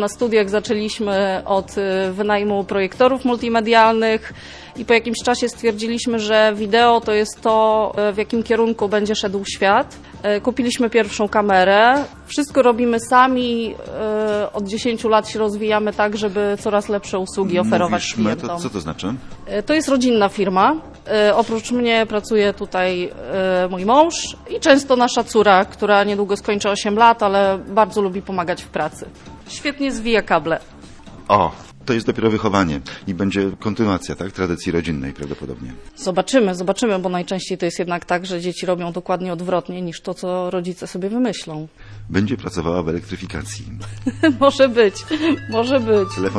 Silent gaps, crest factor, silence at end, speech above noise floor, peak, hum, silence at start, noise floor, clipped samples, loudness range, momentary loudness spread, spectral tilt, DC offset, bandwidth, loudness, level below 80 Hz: none; 18 dB; 0 s; 21 dB; 0 dBFS; none; 0 s; -39 dBFS; under 0.1%; 7 LU; 12 LU; -5 dB/octave; under 0.1%; 11 kHz; -18 LUFS; -44 dBFS